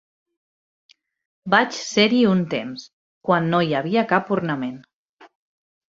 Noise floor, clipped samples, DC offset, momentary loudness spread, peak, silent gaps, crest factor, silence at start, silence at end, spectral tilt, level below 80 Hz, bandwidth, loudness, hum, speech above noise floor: under -90 dBFS; under 0.1%; under 0.1%; 15 LU; -2 dBFS; 2.93-3.21 s, 4.93-5.17 s; 22 dB; 1.45 s; 0.7 s; -5.5 dB/octave; -64 dBFS; 7.8 kHz; -20 LUFS; none; over 70 dB